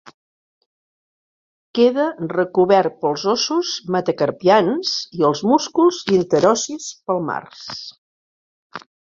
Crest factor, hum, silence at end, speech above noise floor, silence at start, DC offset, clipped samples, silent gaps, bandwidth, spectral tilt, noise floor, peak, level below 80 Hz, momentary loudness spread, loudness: 18 dB; none; 0.4 s; over 72 dB; 0.05 s; under 0.1%; under 0.1%; 0.14-1.74 s, 7.98-8.70 s; 7.6 kHz; -4.5 dB/octave; under -90 dBFS; -2 dBFS; -62 dBFS; 16 LU; -18 LUFS